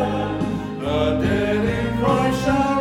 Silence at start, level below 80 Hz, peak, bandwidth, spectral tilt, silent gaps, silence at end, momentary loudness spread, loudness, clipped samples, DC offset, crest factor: 0 s; -36 dBFS; -4 dBFS; 16 kHz; -6.5 dB/octave; none; 0 s; 5 LU; -21 LUFS; under 0.1%; under 0.1%; 16 dB